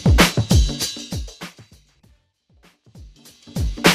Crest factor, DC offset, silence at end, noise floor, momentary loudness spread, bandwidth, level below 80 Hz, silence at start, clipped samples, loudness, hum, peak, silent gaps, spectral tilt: 20 dB; under 0.1%; 0 s; -59 dBFS; 21 LU; 15.5 kHz; -26 dBFS; 0 s; under 0.1%; -20 LUFS; none; 0 dBFS; none; -4.5 dB/octave